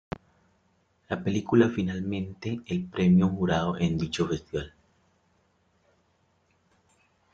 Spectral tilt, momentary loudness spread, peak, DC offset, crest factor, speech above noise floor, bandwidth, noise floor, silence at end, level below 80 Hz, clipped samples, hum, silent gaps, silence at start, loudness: -7 dB/octave; 13 LU; -8 dBFS; under 0.1%; 22 dB; 43 dB; 7.6 kHz; -69 dBFS; 2.65 s; -56 dBFS; under 0.1%; none; none; 1.1 s; -27 LUFS